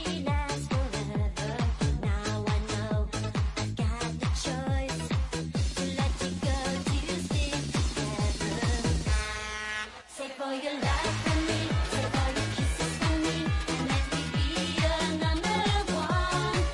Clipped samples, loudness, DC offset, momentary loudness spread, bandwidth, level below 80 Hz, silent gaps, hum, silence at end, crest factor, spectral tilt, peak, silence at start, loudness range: under 0.1%; -30 LUFS; under 0.1%; 4 LU; 11.5 kHz; -36 dBFS; none; none; 0 s; 14 dB; -5 dB/octave; -16 dBFS; 0 s; 3 LU